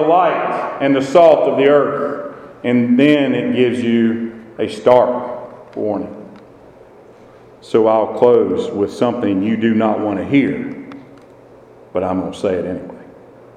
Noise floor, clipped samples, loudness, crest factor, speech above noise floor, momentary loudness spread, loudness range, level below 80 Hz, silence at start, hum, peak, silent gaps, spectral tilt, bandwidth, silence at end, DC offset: -42 dBFS; under 0.1%; -15 LUFS; 16 dB; 28 dB; 16 LU; 6 LU; -58 dBFS; 0 s; none; 0 dBFS; none; -7 dB/octave; 9.8 kHz; 0.45 s; under 0.1%